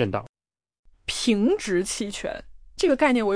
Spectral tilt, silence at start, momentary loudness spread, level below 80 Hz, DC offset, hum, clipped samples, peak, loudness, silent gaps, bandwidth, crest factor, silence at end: -4 dB/octave; 0 s; 14 LU; -50 dBFS; under 0.1%; none; under 0.1%; -8 dBFS; -24 LUFS; 0.29-0.34 s, 0.79-0.83 s; 10.5 kHz; 18 dB; 0 s